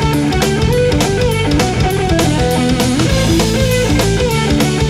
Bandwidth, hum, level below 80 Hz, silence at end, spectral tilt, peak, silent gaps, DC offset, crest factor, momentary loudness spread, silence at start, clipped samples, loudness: 19.5 kHz; none; -22 dBFS; 0 s; -5 dB/octave; 0 dBFS; none; under 0.1%; 12 dB; 1 LU; 0 s; under 0.1%; -13 LUFS